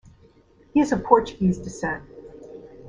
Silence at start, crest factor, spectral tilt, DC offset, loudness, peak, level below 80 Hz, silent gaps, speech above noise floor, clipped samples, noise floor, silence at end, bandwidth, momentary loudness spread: 0.75 s; 24 dB; -7 dB/octave; under 0.1%; -23 LUFS; 0 dBFS; -48 dBFS; none; 33 dB; under 0.1%; -55 dBFS; 0 s; 10 kHz; 24 LU